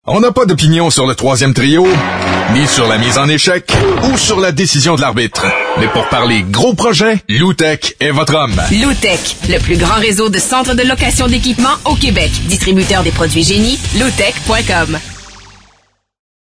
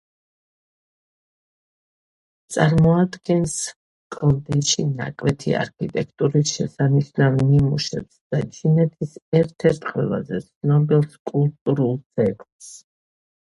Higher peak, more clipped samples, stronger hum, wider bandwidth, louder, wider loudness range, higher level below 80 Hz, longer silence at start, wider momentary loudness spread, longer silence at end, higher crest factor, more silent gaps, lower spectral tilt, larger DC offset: about the same, 0 dBFS vs 0 dBFS; neither; neither; about the same, 11 kHz vs 11.5 kHz; first, -10 LUFS vs -21 LUFS; about the same, 2 LU vs 2 LU; first, -24 dBFS vs -48 dBFS; second, 0.05 s vs 2.5 s; second, 3 LU vs 10 LU; first, 1.15 s vs 0.65 s; second, 12 dB vs 20 dB; second, none vs 3.76-4.10 s, 8.21-8.30 s, 9.22-9.32 s, 10.56-10.61 s, 11.19-11.25 s, 11.61-11.66 s, 12.06-12.10 s, 12.52-12.59 s; second, -4 dB/octave vs -6 dB/octave; neither